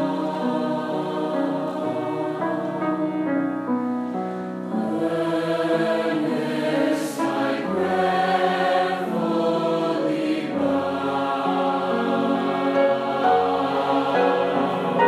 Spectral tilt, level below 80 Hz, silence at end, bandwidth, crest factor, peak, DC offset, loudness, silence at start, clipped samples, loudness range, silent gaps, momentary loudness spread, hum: -6 dB/octave; -74 dBFS; 0 s; 14.5 kHz; 16 dB; -6 dBFS; under 0.1%; -23 LUFS; 0 s; under 0.1%; 4 LU; none; 5 LU; none